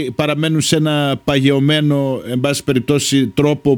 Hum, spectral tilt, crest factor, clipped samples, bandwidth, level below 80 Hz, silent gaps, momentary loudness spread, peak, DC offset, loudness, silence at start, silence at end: none; -5 dB/octave; 14 dB; under 0.1%; 19 kHz; -46 dBFS; none; 4 LU; 0 dBFS; under 0.1%; -15 LUFS; 0 s; 0 s